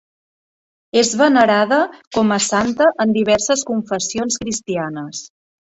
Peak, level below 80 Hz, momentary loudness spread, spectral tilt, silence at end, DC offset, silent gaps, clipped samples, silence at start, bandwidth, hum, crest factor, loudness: -2 dBFS; -54 dBFS; 10 LU; -3.5 dB/octave; 0.5 s; under 0.1%; 2.07-2.11 s; under 0.1%; 0.95 s; 8.2 kHz; none; 16 dB; -17 LUFS